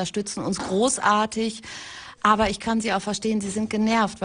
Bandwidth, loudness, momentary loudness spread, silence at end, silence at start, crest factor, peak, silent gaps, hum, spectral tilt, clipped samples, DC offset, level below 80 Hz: 10.5 kHz; -23 LUFS; 10 LU; 0 s; 0 s; 20 dB; -4 dBFS; none; none; -4 dB/octave; under 0.1%; under 0.1%; -50 dBFS